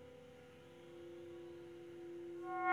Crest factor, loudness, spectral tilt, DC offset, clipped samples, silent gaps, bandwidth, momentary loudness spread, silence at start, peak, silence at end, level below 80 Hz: 24 dB; -51 LUFS; -6 dB/octave; under 0.1%; under 0.1%; none; 13 kHz; 13 LU; 0 s; -22 dBFS; 0 s; -82 dBFS